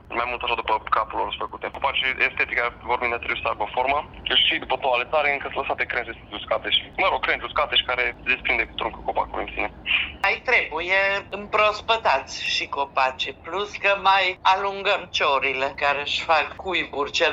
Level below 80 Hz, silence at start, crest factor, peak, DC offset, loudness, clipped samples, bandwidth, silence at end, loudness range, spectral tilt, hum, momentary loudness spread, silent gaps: -48 dBFS; 0.05 s; 18 dB; -6 dBFS; under 0.1%; -22 LUFS; under 0.1%; 8 kHz; 0 s; 2 LU; -2.5 dB/octave; none; 7 LU; none